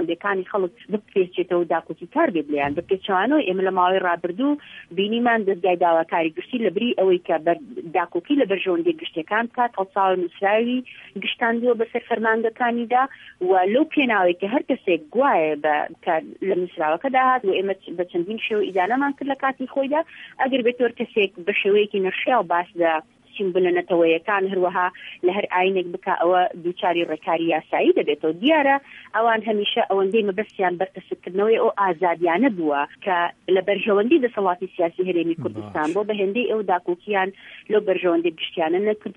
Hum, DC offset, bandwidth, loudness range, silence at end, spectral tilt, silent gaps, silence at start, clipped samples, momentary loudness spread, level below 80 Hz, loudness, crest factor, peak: none; under 0.1%; 3.9 kHz; 2 LU; 0.05 s; -7 dB/octave; none; 0 s; under 0.1%; 7 LU; -68 dBFS; -22 LUFS; 16 dB; -6 dBFS